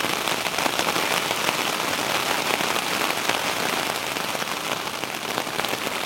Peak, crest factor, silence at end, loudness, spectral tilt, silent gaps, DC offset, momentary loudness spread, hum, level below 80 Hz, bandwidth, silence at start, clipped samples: 0 dBFS; 24 dB; 0 s; -23 LUFS; -1.5 dB/octave; none; under 0.1%; 4 LU; none; -62 dBFS; 17 kHz; 0 s; under 0.1%